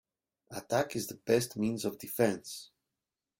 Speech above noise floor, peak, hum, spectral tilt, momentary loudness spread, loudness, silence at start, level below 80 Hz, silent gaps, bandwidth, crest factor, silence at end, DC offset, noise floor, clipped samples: 57 dB; -12 dBFS; none; -4.5 dB/octave; 15 LU; -33 LUFS; 0.5 s; -70 dBFS; none; 17 kHz; 22 dB; 0.75 s; under 0.1%; -90 dBFS; under 0.1%